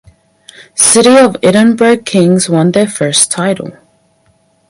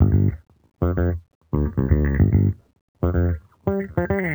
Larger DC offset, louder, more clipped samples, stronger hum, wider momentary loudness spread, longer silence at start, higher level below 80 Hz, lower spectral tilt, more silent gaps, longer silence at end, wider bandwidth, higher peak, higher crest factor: neither; first, -8 LUFS vs -22 LUFS; first, 0.3% vs under 0.1%; neither; about the same, 10 LU vs 9 LU; first, 0.75 s vs 0 s; second, -52 dBFS vs -30 dBFS; second, -4 dB/octave vs -12 dB/octave; second, none vs 1.35-1.41 s, 2.81-2.95 s; first, 1 s vs 0 s; second, 16 kHz vs over 20 kHz; first, 0 dBFS vs -4 dBFS; second, 10 dB vs 18 dB